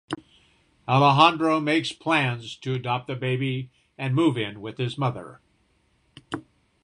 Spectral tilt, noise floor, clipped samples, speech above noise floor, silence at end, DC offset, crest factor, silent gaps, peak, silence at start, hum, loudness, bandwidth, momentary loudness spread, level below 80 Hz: -6 dB/octave; -66 dBFS; under 0.1%; 43 dB; 0.45 s; under 0.1%; 22 dB; none; -2 dBFS; 0.1 s; none; -23 LUFS; 10.5 kHz; 19 LU; -62 dBFS